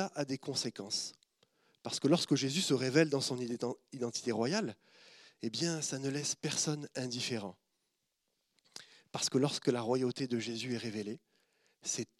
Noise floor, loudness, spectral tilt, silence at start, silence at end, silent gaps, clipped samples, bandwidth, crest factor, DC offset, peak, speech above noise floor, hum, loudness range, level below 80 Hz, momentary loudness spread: -83 dBFS; -35 LUFS; -4 dB/octave; 0 s; 0.15 s; none; under 0.1%; 14.5 kHz; 22 dB; under 0.1%; -14 dBFS; 48 dB; none; 5 LU; -86 dBFS; 14 LU